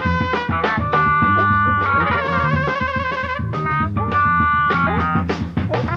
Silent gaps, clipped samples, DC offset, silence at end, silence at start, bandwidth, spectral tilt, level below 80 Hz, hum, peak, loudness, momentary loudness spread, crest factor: none; under 0.1%; under 0.1%; 0 s; 0 s; 7.2 kHz; -7.5 dB/octave; -36 dBFS; none; -4 dBFS; -18 LUFS; 7 LU; 14 dB